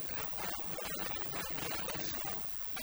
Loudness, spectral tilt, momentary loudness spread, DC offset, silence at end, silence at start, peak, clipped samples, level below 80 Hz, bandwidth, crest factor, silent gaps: -36 LUFS; -2.5 dB/octave; 1 LU; under 0.1%; 0 s; 0 s; -22 dBFS; under 0.1%; -58 dBFS; over 20 kHz; 16 dB; none